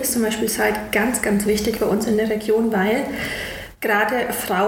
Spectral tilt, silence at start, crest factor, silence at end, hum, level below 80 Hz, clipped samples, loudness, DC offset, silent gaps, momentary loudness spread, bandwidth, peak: -4 dB/octave; 0 s; 16 dB; 0 s; none; -44 dBFS; under 0.1%; -20 LUFS; under 0.1%; none; 7 LU; 17 kHz; -6 dBFS